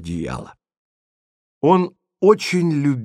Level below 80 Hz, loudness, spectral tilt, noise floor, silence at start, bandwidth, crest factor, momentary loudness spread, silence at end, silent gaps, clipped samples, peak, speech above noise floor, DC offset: -50 dBFS; -18 LUFS; -6.5 dB/octave; under -90 dBFS; 0 s; 13.5 kHz; 20 dB; 12 LU; 0 s; 0.77-1.61 s; under 0.1%; -2 dBFS; over 72 dB; under 0.1%